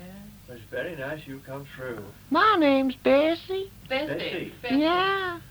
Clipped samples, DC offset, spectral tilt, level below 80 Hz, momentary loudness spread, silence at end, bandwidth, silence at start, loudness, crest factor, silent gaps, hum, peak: under 0.1%; under 0.1%; -5.5 dB/octave; -56 dBFS; 19 LU; 0 s; over 20 kHz; 0 s; -25 LUFS; 18 dB; none; none; -10 dBFS